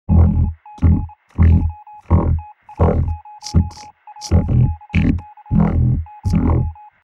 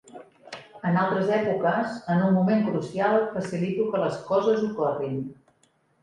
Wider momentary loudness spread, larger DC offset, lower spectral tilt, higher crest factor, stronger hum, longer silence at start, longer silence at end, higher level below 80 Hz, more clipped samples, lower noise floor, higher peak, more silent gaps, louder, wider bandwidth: about the same, 12 LU vs 10 LU; neither; about the same, -8.5 dB/octave vs -8 dB/octave; about the same, 16 dB vs 14 dB; neither; about the same, 0.1 s vs 0.15 s; second, 0.3 s vs 0.7 s; first, -22 dBFS vs -66 dBFS; neither; second, -38 dBFS vs -66 dBFS; first, -2 dBFS vs -10 dBFS; neither; first, -18 LUFS vs -25 LUFS; second, 7.4 kHz vs 9.8 kHz